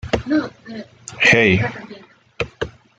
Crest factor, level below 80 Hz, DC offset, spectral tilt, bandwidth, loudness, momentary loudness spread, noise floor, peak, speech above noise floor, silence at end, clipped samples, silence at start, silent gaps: 20 dB; -44 dBFS; under 0.1%; -5 dB/octave; 9.4 kHz; -17 LUFS; 23 LU; -42 dBFS; -2 dBFS; 23 dB; 0.3 s; under 0.1%; 0.05 s; none